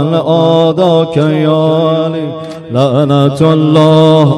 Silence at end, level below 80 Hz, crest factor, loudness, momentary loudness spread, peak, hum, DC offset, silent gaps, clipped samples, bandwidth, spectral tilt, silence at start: 0 s; -52 dBFS; 8 dB; -9 LUFS; 10 LU; 0 dBFS; none; under 0.1%; none; 1%; 10.5 kHz; -8 dB/octave; 0 s